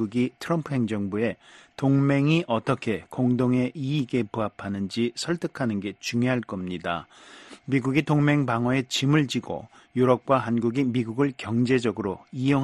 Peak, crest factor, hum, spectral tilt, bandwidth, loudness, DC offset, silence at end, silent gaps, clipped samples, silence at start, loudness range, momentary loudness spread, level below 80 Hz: -6 dBFS; 18 dB; none; -6.5 dB/octave; 12.5 kHz; -25 LUFS; under 0.1%; 0 s; none; under 0.1%; 0 s; 4 LU; 10 LU; -60 dBFS